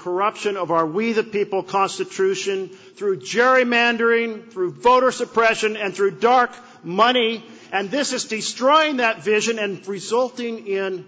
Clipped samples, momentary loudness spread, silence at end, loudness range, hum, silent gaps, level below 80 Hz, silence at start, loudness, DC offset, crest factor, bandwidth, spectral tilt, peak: under 0.1%; 11 LU; 0.05 s; 2 LU; none; none; -64 dBFS; 0 s; -20 LUFS; under 0.1%; 16 dB; 8 kHz; -3 dB/octave; -4 dBFS